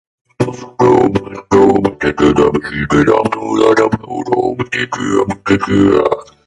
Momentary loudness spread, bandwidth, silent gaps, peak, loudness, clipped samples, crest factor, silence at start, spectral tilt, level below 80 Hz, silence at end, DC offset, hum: 8 LU; 11.5 kHz; none; 0 dBFS; -13 LUFS; under 0.1%; 12 dB; 0.4 s; -6.5 dB/octave; -38 dBFS; 0.25 s; under 0.1%; none